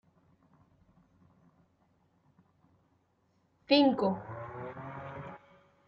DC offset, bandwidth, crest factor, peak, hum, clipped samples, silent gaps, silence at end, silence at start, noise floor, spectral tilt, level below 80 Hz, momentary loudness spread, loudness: under 0.1%; 5.8 kHz; 24 dB; -12 dBFS; none; under 0.1%; none; 0.5 s; 3.7 s; -73 dBFS; -3.5 dB/octave; -72 dBFS; 21 LU; -31 LUFS